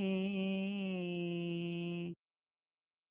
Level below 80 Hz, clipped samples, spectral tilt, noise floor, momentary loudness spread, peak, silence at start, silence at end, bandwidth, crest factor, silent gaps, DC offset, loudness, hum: -78 dBFS; under 0.1%; -6 dB/octave; under -90 dBFS; 7 LU; -26 dBFS; 0 s; 0.95 s; 3.9 kHz; 14 dB; none; under 0.1%; -39 LUFS; none